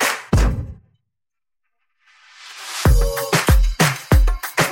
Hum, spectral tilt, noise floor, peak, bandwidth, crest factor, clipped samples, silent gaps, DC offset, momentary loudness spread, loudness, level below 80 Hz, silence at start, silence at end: none; -4.5 dB/octave; -84 dBFS; -2 dBFS; 17 kHz; 16 dB; under 0.1%; none; under 0.1%; 14 LU; -18 LUFS; -22 dBFS; 0 s; 0 s